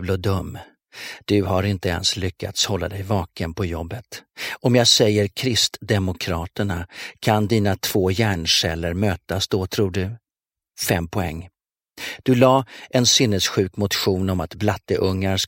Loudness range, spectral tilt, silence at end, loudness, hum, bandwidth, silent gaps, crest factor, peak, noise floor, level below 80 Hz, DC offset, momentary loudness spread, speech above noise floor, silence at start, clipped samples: 4 LU; -4 dB/octave; 0 s; -21 LUFS; none; 16.5 kHz; none; 20 dB; 0 dBFS; under -90 dBFS; -44 dBFS; under 0.1%; 15 LU; over 69 dB; 0 s; under 0.1%